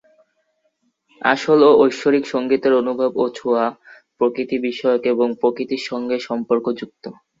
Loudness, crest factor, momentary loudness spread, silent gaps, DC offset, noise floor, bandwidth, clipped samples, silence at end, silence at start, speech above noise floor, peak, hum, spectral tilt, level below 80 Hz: -18 LUFS; 18 dB; 11 LU; none; under 0.1%; -67 dBFS; 7.8 kHz; under 0.1%; 0.3 s; 1.2 s; 49 dB; 0 dBFS; none; -5.5 dB/octave; -66 dBFS